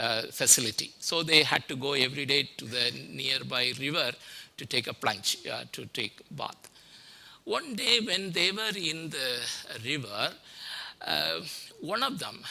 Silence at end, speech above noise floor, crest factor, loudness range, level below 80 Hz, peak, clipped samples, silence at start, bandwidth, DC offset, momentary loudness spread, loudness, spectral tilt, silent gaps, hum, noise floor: 0 s; 22 dB; 26 dB; 7 LU; -70 dBFS; -4 dBFS; under 0.1%; 0 s; 16 kHz; under 0.1%; 17 LU; -28 LUFS; -1.5 dB/octave; none; none; -53 dBFS